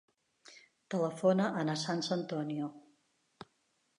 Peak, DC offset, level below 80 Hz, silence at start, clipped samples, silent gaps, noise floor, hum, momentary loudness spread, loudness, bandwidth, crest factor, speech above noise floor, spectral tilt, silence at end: -16 dBFS; under 0.1%; -82 dBFS; 0.5 s; under 0.1%; none; -77 dBFS; none; 26 LU; -34 LUFS; 11 kHz; 20 dB; 44 dB; -5.5 dB/octave; 1.2 s